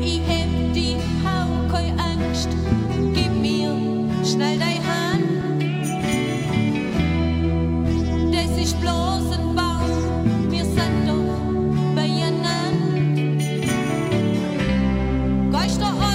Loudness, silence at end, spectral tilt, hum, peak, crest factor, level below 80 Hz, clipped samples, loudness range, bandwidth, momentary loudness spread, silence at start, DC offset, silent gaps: -21 LUFS; 0 s; -6 dB/octave; none; -6 dBFS; 14 dB; -30 dBFS; under 0.1%; 1 LU; 16 kHz; 2 LU; 0 s; under 0.1%; none